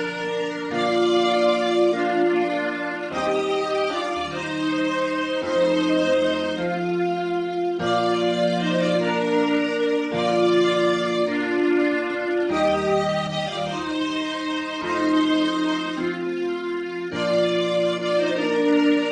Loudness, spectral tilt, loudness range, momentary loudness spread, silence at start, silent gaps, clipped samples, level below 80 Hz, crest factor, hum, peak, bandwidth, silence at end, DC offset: -22 LUFS; -5.5 dB/octave; 3 LU; 7 LU; 0 s; none; under 0.1%; -60 dBFS; 14 dB; none; -8 dBFS; 10 kHz; 0 s; under 0.1%